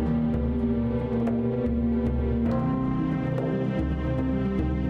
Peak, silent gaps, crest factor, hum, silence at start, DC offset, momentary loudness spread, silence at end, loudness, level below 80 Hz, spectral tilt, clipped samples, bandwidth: -16 dBFS; none; 10 dB; none; 0 s; under 0.1%; 2 LU; 0 s; -26 LUFS; -34 dBFS; -10.5 dB/octave; under 0.1%; 5.2 kHz